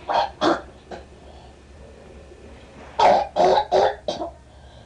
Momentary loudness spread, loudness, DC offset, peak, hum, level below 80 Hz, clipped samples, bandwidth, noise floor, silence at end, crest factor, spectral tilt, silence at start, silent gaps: 23 LU; -20 LUFS; under 0.1%; -8 dBFS; none; -48 dBFS; under 0.1%; 10.5 kHz; -45 dBFS; 0.15 s; 14 dB; -4.5 dB/octave; 0 s; none